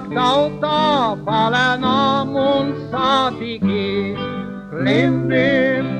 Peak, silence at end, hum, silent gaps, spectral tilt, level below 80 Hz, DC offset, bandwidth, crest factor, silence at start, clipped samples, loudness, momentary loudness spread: -2 dBFS; 0 s; none; none; -6 dB/octave; -48 dBFS; under 0.1%; 9.4 kHz; 14 dB; 0 s; under 0.1%; -17 LUFS; 7 LU